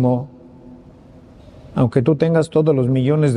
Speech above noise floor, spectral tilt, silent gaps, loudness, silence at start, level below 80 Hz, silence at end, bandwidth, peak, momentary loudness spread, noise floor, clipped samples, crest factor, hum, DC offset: 28 dB; -8.5 dB/octave; none; -17 LUFS; 0 s; -50 dBFS; 0 s; 10.5 kHz; -2 dBFS; 8 LU; -43 dBFS; under 0.1%; 16 dB; none; under 0.1%